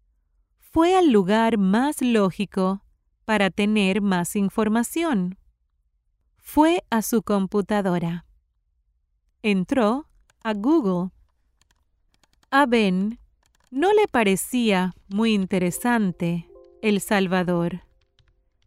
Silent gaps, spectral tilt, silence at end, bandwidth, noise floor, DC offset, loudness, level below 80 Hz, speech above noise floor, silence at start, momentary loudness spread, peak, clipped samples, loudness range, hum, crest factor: none; -5.5 dB/octave; 0.9 s; 16 kHz; -70 dBFS; under 0.1%; -22 LUFS; -54 dBFS; 49 dB; 0.75 s; 10 LU; -4 dBFS; under 0.1%; 4 LU; none; 18 dB